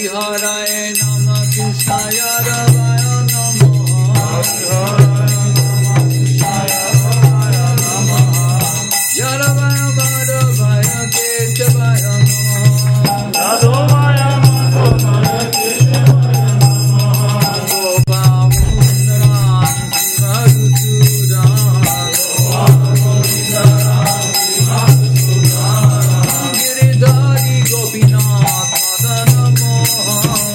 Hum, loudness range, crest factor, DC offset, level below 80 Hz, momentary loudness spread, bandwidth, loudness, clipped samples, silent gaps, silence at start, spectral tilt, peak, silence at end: none; 2 LU; 10 dB; under 0.1%; -32 dBFS; 4 LU; 16.5 kHz; -11 LUFS; 0.1%; none; 0 s; -4.5 dB/octave; 0 dBFS; 0 s